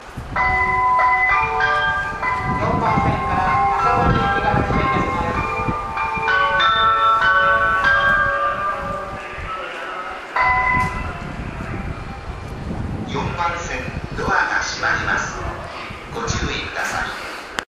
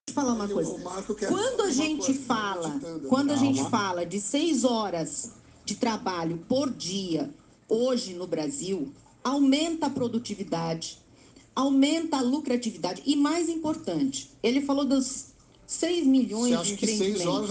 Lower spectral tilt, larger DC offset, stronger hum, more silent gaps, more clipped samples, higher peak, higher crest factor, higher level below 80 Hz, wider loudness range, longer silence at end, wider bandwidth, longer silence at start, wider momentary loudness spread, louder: about the same, -4.5 dB/octave vs -4 dB/octave; neither; neither; neither; neither; first, -2 dBFS vs -10 dBFS; about the same, 18 dB vs 16 dB; first, -34 dBFS vs -62 dBFS; first, 7 LU vs 3 LU; about the same, 0.1 s vs 0 s; first, 14 kHz vs 9.8 kHz; about the same, 0 s vs 0.05 s; first, 14 LU vs 10 LU; first, -19 LUFS vs -27 LUFS